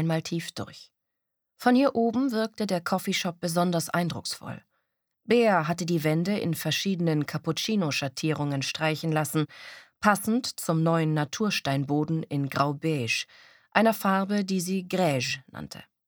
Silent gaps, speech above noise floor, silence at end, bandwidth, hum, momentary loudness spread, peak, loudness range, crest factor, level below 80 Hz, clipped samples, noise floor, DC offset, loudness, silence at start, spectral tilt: none; 57 dB; 0.25 s; over 20 kHz; none; 10 LU; -2 dBFS; 1 LU; 24 dB; -68 dBFS; under 0.1%; -83 dBFS; under 0.1%; -27 LUFS; 0 s; -5 dB/octave